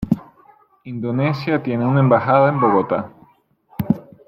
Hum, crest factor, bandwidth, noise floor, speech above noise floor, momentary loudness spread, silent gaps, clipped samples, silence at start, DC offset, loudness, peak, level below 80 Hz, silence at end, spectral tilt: none; 16 dB; 15.5 kHz; -56 dBFS; 39 dB; 15 LU; none; under 0.1%; 0 s; under 0.1%; -18 LUFS; -2 dBFS; -50 dBFS; 0.25 s; -10 dB/octave